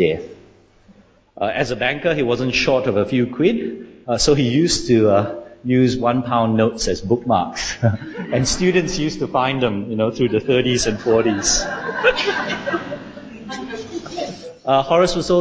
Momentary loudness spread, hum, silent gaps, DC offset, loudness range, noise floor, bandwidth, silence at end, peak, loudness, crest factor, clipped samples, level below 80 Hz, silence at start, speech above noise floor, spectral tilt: 13 LU; none; none; under 0.1%; 4 LU; -50 dBFS; 8 kHz; 0 s; -2 dBFS; -18 LUFS; 16 dB; under 0.1%; -42 dBFS; 0 s; 32 dB; -4.5 dB/octave